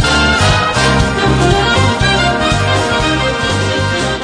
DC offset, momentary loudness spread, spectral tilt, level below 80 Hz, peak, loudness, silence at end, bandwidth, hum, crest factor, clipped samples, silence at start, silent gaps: under 0.1%; 4 LU; -4.5 dB/octave; -24 dBFS; 0 dBFS; -12 LUFS; 0 s; 10 kHz; none; 12 dB; under 0.1%; 0 s; none